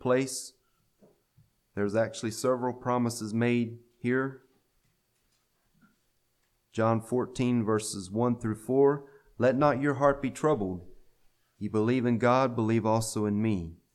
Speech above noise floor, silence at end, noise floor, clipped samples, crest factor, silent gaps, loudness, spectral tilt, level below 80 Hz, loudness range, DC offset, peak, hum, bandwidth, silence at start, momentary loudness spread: 46 dB; 0.2 s; -73 dBFS; under 0.1%; 20 dB; none; -28 LUFS; -6 dB/octave; -60 dBFS; 7 LU; under 0.1%; -10 dBFS; none; 14 kHz; 0 s; 11 LU